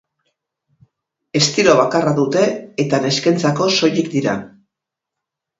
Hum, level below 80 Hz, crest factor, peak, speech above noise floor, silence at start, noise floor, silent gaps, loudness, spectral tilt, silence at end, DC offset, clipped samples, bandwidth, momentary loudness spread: none; -58 dBFS; 18 dB; 0 dBFS; 67 dB; 1.35 s; -83 dBFS; none; -16 LUFS; -4.5 dB/octave; 1.15 s; under 0.1%; under 0.1%; 8 kHz; 9 LU